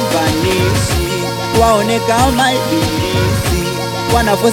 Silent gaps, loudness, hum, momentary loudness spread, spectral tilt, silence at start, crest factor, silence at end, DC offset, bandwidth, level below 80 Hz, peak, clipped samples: none; -14 LUFS; none; 5 LU; -4.5 dB/octave; 0 s; 14 dB; 0 s; under 0.1%; 18 kHz; -26 dBFS; 0 dBFS; under 0.1%